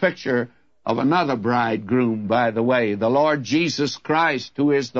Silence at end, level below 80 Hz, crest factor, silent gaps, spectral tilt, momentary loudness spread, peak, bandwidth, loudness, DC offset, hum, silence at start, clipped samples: 0 s; -64 dBFS; 14 dB; none; -5.5 dB/octave; 5 LU; -6 dBFS; 7.6 kHz; -21 LUFS; 0.1%; none; 0 s; under 0.1%